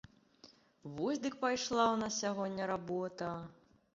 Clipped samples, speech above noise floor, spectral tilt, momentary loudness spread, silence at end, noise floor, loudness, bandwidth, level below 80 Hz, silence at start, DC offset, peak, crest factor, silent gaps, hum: under 0.1%; 27 dB; -3.5 dB/octave; 15 LU; 0.45 s; -63 dBFS; -36 LUFS; 7.6 kHz; -72 dBFS; 0.45 s; under 0.1%; -16 dBFS; 22 dB; none; none